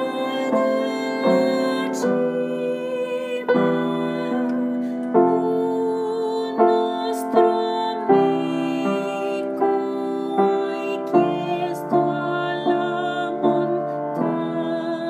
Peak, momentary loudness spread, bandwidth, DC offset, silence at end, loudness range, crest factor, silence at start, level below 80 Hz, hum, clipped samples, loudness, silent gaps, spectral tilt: -4 dBFS; 7 LU; 15.5 kHz; under 0.1%; 0 s; 2 LU; 18 dB; 0 s; -80 dBFS; none; under 0.1%; -22 LUFS; none; -6.5 dB/octave